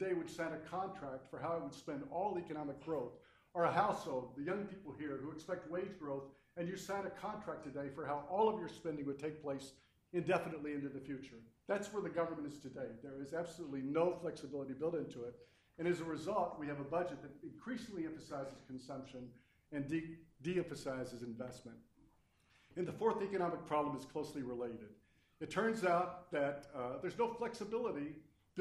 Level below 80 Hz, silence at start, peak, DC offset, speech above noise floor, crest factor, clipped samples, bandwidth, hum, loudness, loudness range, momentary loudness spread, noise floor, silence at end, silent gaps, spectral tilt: -74 dBFS; 0 s; -20 dBFS; under 0.1%; 31 dB; 22 dB; under 0.1%; 13.5 kHz; none; -42 LUFS; 5 LU; 13 LU; -73 dBFS; 0 s; none; -6 dB/octave